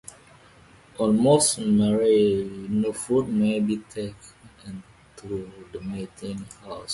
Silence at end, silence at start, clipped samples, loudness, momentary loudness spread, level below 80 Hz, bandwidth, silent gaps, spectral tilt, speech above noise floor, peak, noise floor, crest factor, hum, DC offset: 0 s; 1 s; under 0.1%; -23 LUFS; 22 LU; -54 dBFS; 11.5 kHz; none; -5 dB/octave; 29 dB; -6 dBFS; -52 dBFS; 20 dB; none; under 0.1%